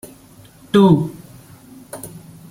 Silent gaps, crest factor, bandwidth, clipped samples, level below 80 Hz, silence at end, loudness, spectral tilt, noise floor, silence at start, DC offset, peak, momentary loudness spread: none; 18 dB; 16.5 kHz; under 0.1%; -52 dBFS; 0.3 s; -15 LUFS; -7.5 dB/octave; -45 dBFS; 0.75 s; under 0.1%; -2 dBFS; 26 LU